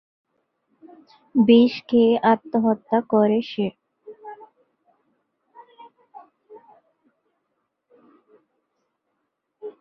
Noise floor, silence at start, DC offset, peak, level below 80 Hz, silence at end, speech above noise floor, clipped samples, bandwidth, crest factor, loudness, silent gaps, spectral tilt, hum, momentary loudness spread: -77 dBFS; 1.35 s; under 0.1%; -4 dBFS; -68 dBFS; 0.1 s; 58 dB; under 0.1%; 5.8 kHz; 20 dB; -19 LUFS; none; -8.5 dB/octave; none; 25 LU